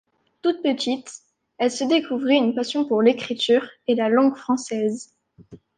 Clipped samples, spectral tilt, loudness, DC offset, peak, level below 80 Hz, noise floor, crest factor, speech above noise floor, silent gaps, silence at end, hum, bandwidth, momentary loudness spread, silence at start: under 0.1%; -4 dB/octave; -22 LUFS; under 0.1%; -4 dBFS; -70 dBFS; -48 dBFS; 18 dB; 27 dB; none; 0.2 s; none; 9.8 kHz; 7 LU; 0.45 s